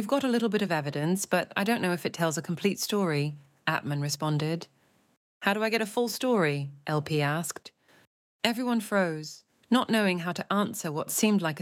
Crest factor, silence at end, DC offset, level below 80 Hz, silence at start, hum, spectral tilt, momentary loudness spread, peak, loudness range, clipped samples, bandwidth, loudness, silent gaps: 22 dB; 0 s; under 0.1%; -76 dBFS; 0 s; none; -4.5 dB/octave; 7 LU; -6 dBFS; 2 LU; under 0.1%; 17 kHz; -28 LUFS; 5.17-5.41 s, 8.07-8.39 s